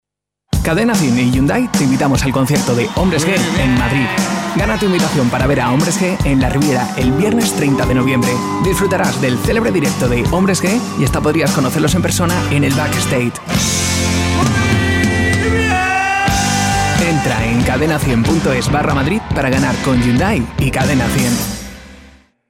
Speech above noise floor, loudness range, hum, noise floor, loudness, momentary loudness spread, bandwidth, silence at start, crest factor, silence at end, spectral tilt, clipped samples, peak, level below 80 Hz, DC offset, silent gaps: 41 dB; 1 LU; none; -55 dBFS; -14 LUFS; 3 LU; 16.5 kHz; 0.5 s; 12 dB; 0.5 s; -5 dB/octave; under 0.1%; -2 dBFS; -28 dBFS; under 0.1%; none